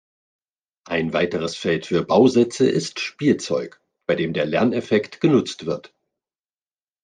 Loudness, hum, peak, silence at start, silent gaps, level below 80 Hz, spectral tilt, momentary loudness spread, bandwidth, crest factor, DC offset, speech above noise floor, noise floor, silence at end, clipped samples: -21 LUFS; none; -4 dBFS; 0.9 s; none; -62 dBFS; -5.5 dB/octave; 11 LU; 9.6 kHz; 18 dB; under 0.1%; over 70 dB; under -90 dBFS; 1.25 s; under 0.1%